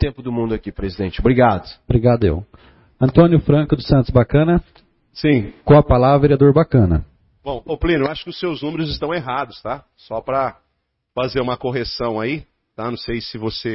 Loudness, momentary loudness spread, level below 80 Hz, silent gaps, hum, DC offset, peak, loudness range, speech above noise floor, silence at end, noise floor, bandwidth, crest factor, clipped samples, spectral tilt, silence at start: -17 LUFS; 15 LU; -32 dBFS; none; none; under 0.1%; 0 dBFS; 9 LU; 54 dB; 0 s; -71 dBFS; 5.8 kHz; 18 dB; under 0.1%; -11.5 dB/octave; 0 s